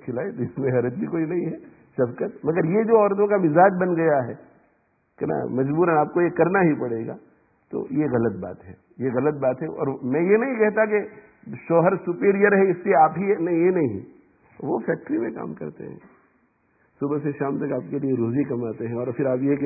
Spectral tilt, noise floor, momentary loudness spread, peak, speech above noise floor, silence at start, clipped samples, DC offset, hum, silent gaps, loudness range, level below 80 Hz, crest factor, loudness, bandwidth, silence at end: -15.5 dB/octave; -66 dBFS; 16 LU; -4 dBFS; 44 dB; 0.05 s; under 0.1%; under 0.1%; none; none; 8 LU; -62 dBFS; 18 dB; -22 LUFS; 2.7 kHz; 0 s